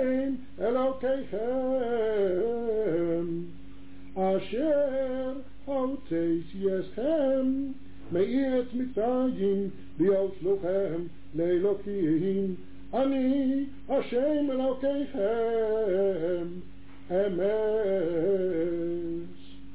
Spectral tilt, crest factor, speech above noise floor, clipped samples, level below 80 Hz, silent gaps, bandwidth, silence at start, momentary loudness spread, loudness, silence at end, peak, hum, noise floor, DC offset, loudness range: -11 dB/octave; 12 dB; 20 dB; under 0.1%; -56 dBFS; none; 4 kHz; 0 s; 8 LU; -29 LUFS; 0 s; -16 dBFS; none; -49 dBFS; 1%; 2 LU